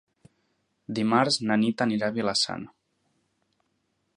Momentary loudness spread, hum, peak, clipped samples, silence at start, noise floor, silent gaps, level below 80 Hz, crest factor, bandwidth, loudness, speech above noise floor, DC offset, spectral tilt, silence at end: 12 LU; none; -6 dBFS; under 0.1%; 0.9 s; -75 dBFS; none; -68 dBFS; 22 dB; 11.5 kHz; -25 LUFS; 49 dB; under 0.1%; -4 dB/octave; 1.5 s